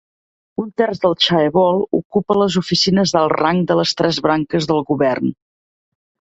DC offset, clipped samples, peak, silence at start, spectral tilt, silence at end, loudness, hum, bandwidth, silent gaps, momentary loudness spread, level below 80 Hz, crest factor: under 0.1%; under 0.1%; 0 dBFS; 0.6 s; -5 dB/octave; 1.05 s; -16 LUFS; none; 8 kHz; 2.05-2.10 s; 5 LU; -52 dBFS; 16 dB